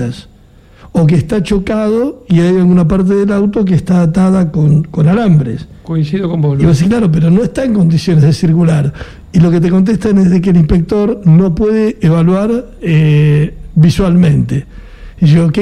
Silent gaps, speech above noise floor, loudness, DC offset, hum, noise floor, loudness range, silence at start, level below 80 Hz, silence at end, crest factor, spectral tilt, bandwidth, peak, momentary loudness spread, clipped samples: none; 31 dB; -10 LUFS; under 0.1%; none; -40 dBFS; 1 LU; 0 s; -30 dBFS; 0 s; 10 dB; -8.5 dB/octave; 10 kHz; 0 dBFS; 7 LU; under 0.1%